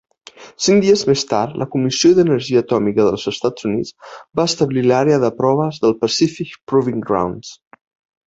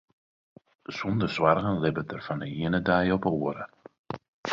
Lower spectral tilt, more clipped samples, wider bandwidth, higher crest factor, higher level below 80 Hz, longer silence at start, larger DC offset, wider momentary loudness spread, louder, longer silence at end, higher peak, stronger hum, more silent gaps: second, -5 dB/octave vs -7.5 dB/octave; neither; about the same, 8 kHz vs 7.6 kHz; second, 14 dB vs 22 dB; about the same, -54 dBFS vs -54 dBFS; second, 0.4 s vs 0.9 s; neither; second, 9 LU vs 17 LU; first, -16 LUFS vs -27 LUFS; first, 0.75 s vs 0 s; first, -2 dBFS vs -6 dBFS; neither; second, 6.63-6.67 s vs 3.99-4.04 s, 4.28-4.44 s